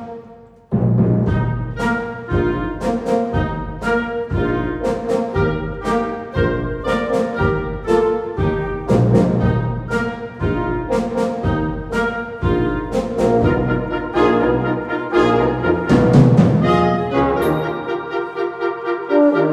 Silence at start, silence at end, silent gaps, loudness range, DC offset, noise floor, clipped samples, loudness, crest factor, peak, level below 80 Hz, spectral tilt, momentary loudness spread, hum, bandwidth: 0 s; 0 s; none; 5 LU; under 0.1%; -42 dBFS; under 0.1%; -18 LUFS; 16 dB; 0 dBFS; -32 dBFS; -8 dB/octave; 8 LU; none; 13.5 kHz